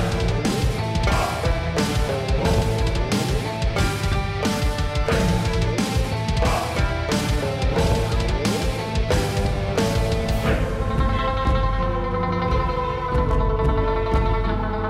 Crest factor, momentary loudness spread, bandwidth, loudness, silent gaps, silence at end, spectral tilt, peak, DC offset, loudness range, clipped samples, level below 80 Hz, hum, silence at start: 12 dB; 3 LU; 15.5 kHz; -22 LUFS; none; 0 s; -5.5 dB/octave; -10 dBFS; under 0.1%; 0 LU; under 0.1%; -26 dBFS; none; 0 s